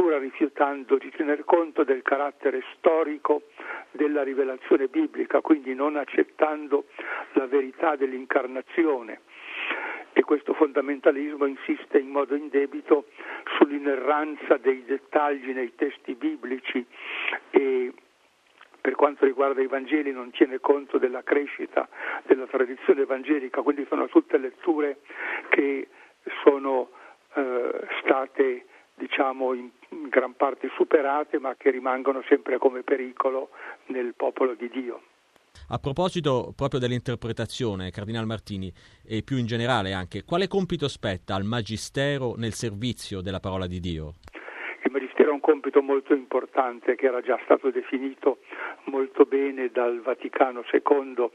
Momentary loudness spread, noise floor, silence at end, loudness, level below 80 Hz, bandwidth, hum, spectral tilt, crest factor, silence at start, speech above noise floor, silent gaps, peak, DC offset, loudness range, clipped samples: 11 LU; -62 dBFS; 0.05 s; -26 LUFS; -58 dBFS; 12 kHz; none; -6.5 dB/octave; 22 dB; 0 s; 37 dB; none; -2 dBFS; under 0.1%; 4 LU; under 0.1%